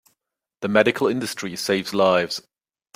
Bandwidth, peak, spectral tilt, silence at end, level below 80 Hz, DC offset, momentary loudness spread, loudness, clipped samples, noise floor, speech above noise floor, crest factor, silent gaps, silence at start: 16 kHz; -2 dBFS; -4 dB/octave; 0.55 s; -64 dBFS; under 0.1%; 10 LU; -21 LUFS; under 0.1%; -79 dBFS; 58 dB; 22 dB; none; 0.6 s